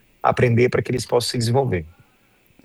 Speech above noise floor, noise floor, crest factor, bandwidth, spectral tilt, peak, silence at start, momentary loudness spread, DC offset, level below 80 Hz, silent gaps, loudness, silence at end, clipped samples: 39 dB; -58 dBFS; 18 dB; 12.5 kHz; -5.5 dB/octave; -2 dBFS; 0.25 s; 6 LU; under 0.1%; -48 dBFS; none; -20 LUFS; 0.75 s; under 0.1%